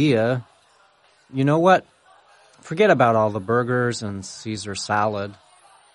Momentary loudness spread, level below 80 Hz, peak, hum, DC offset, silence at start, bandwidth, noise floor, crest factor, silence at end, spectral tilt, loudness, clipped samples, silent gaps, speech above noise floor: 15 LU; -62 dBFS; -4 dBFS; none; under 0.1%; 0 s; 11 kHz; -57 dBFS; 18 dB; 0.6 s; -6 dB/octave; -21 LUFS; under 0.1%; none; 37 dB